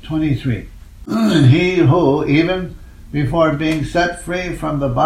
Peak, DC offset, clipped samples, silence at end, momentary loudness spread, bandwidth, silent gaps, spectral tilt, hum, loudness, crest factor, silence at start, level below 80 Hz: 0 dBFS; under 0.1%; under 0.1%; 0 s; 11 LU; 12.5 kHz; none; -7 dB/octave; none; -16 LUFS; 14 dB; 0 s; -36 dBFS